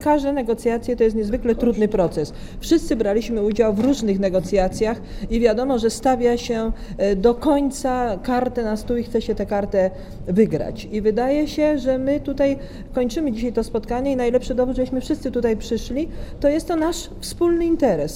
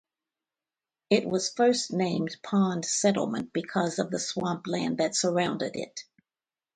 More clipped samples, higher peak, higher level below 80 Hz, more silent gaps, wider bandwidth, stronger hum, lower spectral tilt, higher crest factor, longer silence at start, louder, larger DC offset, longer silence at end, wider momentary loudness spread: neither; first, -2 dBFS vs -10 dBFS; first, -34 dBFS vs -70 dBFS; neither; first, 16.5 kHz vs 9.6 kHz; neither; first, -6 dB/octave vs -4 dB/octave; about the same, 18 dB vs 18 dB; second, 0 s vs 1.1 s; first, -21 LUFS vs -28 LUFS; neither; second, 0 s vs 0.75 s; about the same, 6 LU vs 8 LU